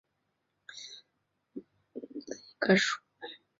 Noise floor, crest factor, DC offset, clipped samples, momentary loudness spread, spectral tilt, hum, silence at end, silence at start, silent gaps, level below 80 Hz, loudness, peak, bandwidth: -80 dBFS; 24 dB; under 0.1%; under 0.1%; 23 LU; -3 dB/octave; none; 0.25 s; 0.7 s; none; -76 dBFS; -29 LUFS; -10 dBFS; 7.6 kHz